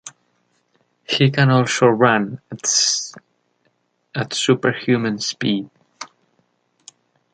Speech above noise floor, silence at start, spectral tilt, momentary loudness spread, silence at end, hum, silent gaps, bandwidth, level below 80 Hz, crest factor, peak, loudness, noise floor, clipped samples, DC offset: 48 dB; 0.05 s; -4 dB/octave; 23 LU; 1.3 s; none; none; 9.4 kHz; -62 dBFS; 20 dB; -2 dBFS; -18 LUFS; -66 dBFS; under 0.1%; under 0.1%